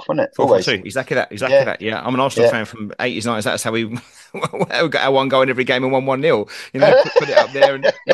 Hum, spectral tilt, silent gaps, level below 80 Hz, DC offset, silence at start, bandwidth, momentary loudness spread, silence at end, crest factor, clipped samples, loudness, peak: none; -4.5 dB/octave; none; -62 dBFS; under 0.1%; 0 s; 12.5 kHz; 10 LU; 0 s; 16 dB; under 0.1%; -17 LUFS; 0 dBFS